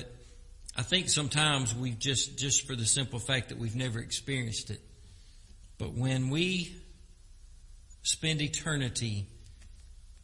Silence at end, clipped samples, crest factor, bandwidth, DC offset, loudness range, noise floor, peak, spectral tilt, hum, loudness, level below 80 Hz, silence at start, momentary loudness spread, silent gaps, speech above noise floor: 0.05 s; under 0.1%; 22 dB; 11.5 kHz; under 0.1%; 7 LU; -53 dBFS; -10 dBFS; -3 dB/octave; none; -30 LUFS; -52 dBFS; 0 s; 14 LU; none; 22 dB